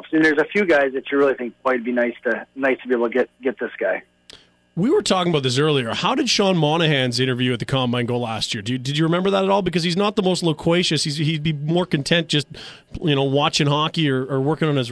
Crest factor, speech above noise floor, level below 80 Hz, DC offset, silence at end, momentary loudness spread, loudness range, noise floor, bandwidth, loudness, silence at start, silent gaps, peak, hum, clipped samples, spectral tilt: 16 dB; 29 dB; -52 dBFS; under 0.1%; 0 s; 7 LU; 3 LU; -48 dBFS; 11 kHz; -20 LUFS; 0 s; none; -4 dBFS; none; under 0.1%; -5 dB/octave